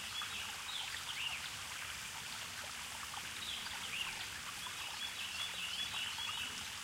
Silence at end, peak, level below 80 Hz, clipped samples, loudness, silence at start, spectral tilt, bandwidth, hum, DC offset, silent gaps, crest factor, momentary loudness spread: 0 s; -28 dBFS; -68 dBFS; under 0.1%; -41 LUFS; 0 s; 0 dB/octave; 16 kHz; none; under 0.1%; none; 16 dB; 5 LU